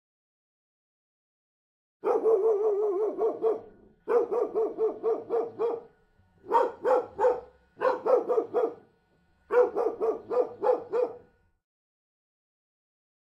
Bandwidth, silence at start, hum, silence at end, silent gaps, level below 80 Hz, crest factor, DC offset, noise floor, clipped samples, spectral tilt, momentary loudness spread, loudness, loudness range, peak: 7.2 kHz; 2.05 s; none; 2.2 s; none; -72 dBFS; 18 dB; under 0.1%; -67 dBFS; under 0.1%; -6.5 dB/octave; 7 LU; -28 LUFS; 2 LU; -10 dBFS